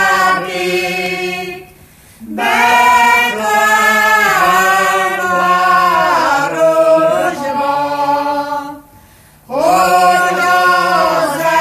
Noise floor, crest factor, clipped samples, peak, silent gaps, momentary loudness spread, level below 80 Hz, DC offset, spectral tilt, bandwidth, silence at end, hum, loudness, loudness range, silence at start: -43 dBFS; 12 dB; under 0.1%; 0 dBFS; none; 9 LU; -50 dBFS; under 0.1%; -3 dB/octave; 15 kHz; 0 s; none; -11 LUFS; 4 LU; 0 s